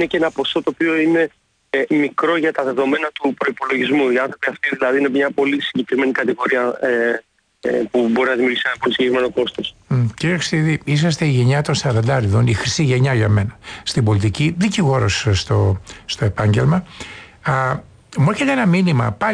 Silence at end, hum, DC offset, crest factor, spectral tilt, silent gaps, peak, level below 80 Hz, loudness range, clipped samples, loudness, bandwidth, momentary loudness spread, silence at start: 0 s; none; under 0.1%; 12 dB; -6 dB/octave; none; -6 dBFS; -46 dBFS; 2 LU; under 0.1%; -18 LUFS; 10.5 kHz; 6 LU; 0 s